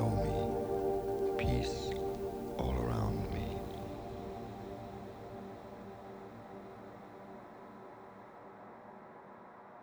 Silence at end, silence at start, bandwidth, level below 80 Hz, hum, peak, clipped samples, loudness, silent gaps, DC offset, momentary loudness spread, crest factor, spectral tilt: 0 s; 0 s; over 20 kHz; -48 dBFS; none; -20 dBFS; under 0.1%; -38 LUFS; none; under 0.1%; 18 LU; 18 dB; -7 dB/octave